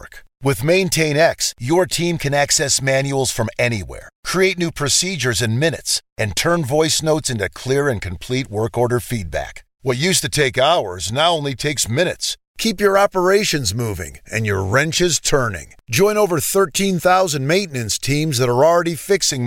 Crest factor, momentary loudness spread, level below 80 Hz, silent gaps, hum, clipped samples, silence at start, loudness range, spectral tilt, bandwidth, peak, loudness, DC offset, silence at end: 14 dB; 9 LU; -42 dBFS; 4.15-4.23 s, 6.12-6.16 s, 12.47-12.54 s; none; under 0.1%; 0 s; 2 LU; -3.5 dB/octave; 17 kHz; -4 dBFS; -18 LUFS; under 0.1%; 0 s